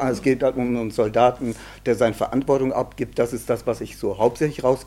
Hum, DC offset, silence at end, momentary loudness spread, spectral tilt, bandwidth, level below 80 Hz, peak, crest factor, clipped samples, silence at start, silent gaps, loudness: none; under 0.1%; 0 s; 8 LU; -6.5 dB/octave; 16 kHz; -46 dBFS; -4 dBFS; 18 dB; under 0.1%; 0 s; none; -22 LUFS